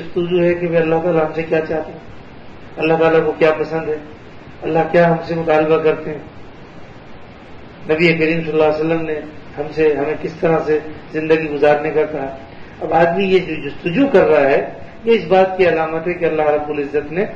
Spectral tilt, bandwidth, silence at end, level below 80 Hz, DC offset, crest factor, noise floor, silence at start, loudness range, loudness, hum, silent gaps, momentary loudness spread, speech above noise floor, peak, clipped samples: -8 dB/octave; 7.2 kHz; 0 s; -46 dBFS; under 0.1%; 16 dB; -36 dBFS; 0 s; 4 LU; -16 LUFS; none; none; 14 LU; 20 dB; 0 dBFS; under 0.1%